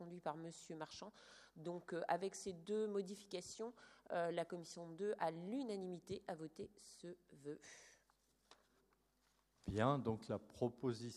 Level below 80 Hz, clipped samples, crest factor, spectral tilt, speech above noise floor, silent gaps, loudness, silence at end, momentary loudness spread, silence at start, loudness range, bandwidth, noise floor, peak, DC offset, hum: -72 dBFS; under 0.1%; 24 dB; -5.5 dB/octave; 35 dB; none; -46 LUFS; 0 s; 14 LU; 0 s; 9 LU; 13.5 kHz; -80 dBFS; -22 dBFS; under 0.1%; none